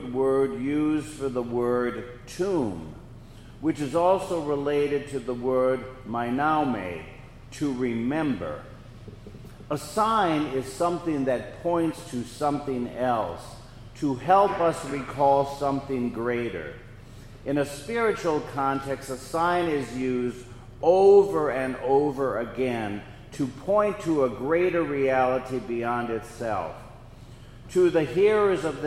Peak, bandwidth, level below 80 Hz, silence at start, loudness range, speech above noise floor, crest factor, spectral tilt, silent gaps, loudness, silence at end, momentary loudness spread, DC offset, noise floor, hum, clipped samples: -6 dBFS; 15 kHz; -50 dBFS; 0 s; 5 LU; 20 dB; 20 dB; -6.5 dB/octave; none; -26 LUFS; 0 s; 16 LU; under 0.1%; -45 dBFS; none; under 0.1%